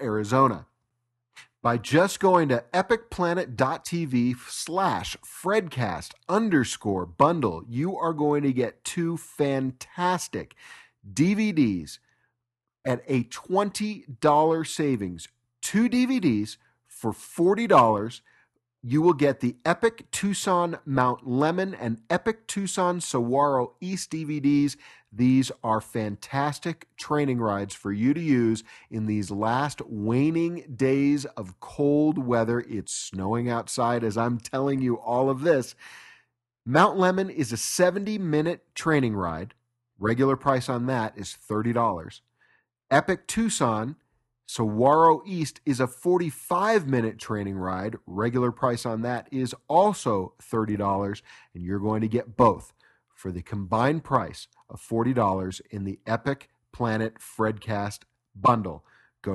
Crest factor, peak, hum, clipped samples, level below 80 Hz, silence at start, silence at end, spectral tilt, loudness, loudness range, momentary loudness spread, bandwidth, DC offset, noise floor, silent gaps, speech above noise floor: 22 dB; -4 dBFS; none; under 0.1%; -58 dBFS; 0 s; 0 s; -5.5 dB/octave; -25 LUFS; 3 LU; 12 LU; 12.5 kHz; under 0.1%; -85 dBFS; none; 60 dB